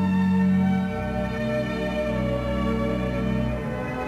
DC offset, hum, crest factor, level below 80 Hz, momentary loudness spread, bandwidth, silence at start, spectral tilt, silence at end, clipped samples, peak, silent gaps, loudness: 0.2%; none; 12 dB; -36 dBFS; 7 LU; 8 kHz; 0 s; -8 dB/octave; 0 s; under 0.1%; -12 dBFS; none; -25 LUFS